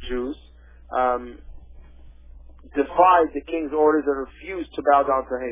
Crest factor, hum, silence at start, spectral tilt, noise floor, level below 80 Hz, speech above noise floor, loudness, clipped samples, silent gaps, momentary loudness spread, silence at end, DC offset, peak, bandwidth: 20 dB; none; 0 s; -9 dB/octave; -47 dBFS; -46 dBFS; 26 dB; -22 LUFS; under 0.1%; none; 16 LU; 0 s; under 0.1%; -2 dBFS; 3.8 kHz